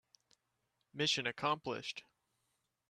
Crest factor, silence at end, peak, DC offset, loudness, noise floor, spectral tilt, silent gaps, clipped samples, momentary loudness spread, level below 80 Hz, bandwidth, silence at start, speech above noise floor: 22 dB; 0.9 s; -20 dBFS; under 0.1%; -37 LUFS; -84 dBFS; -3 dB/octave; none; under 0.1%; 15 LU; -80 dBFS; 13 kHz; 0.95 s; 46 dB